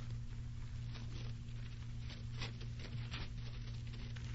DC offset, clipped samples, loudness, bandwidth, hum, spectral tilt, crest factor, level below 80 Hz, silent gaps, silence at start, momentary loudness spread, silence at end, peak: under 0.1%; under 0.1%; -47 LUFS; 7.6 kHz; none; -5.5 dB/octave; 14 dB; -50 dBFS; none; 0 s; 3 LU; 0 s; -30 dBFS